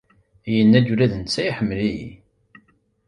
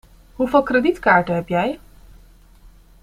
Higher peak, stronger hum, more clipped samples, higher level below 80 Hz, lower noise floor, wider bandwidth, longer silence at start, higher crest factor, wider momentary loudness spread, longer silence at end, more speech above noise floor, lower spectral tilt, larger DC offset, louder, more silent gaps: about the same, -4 dBFS vs -2 dBFS; neither; neither; about the same, -48 dBFS vs -46 dBFS; first, -59 dBFS vs -47 dBFS; second, 11 kHz vs 15.5 kHz; about the same, 0.45 s vs 0.4 s; about the same, 18 dB vs 18 dB; first, 18 LU vs 10 LU; second, 0.95 s vs 1.25 s; first, 40 dB vs 30 dB; about the same, -6.5 dB/octave vs -7 dB/octave; neither; about the same, -19 LUFS vs -18 LUFS; neither